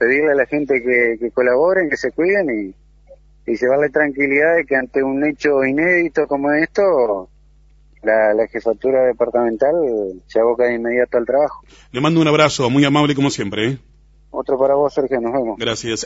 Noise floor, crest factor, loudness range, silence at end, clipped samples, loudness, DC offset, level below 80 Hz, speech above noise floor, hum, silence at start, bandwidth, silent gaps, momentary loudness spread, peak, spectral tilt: -49 dBFS; 16 dB; 2 LU; 0 s; under 0.1%; -17 LUFS; under 0.1%; -50 dBFS; 33 dB; none; 0 s; 8 kHz; none; 8 LU; 0 dBFS; -5.5 dB/octave